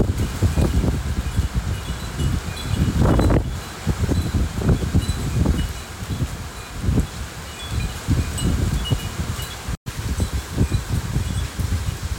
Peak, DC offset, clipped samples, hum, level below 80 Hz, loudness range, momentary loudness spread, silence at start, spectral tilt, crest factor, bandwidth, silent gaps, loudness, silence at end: -8 dBFS; under 0.1%; under 0.1%; none; -26 dBFS; 4 LU; 9 LU; 0 s; -6 dB/octave; 14 dB; 17 kHz; 9.77-9.86 s; -23 LUFS; 0 s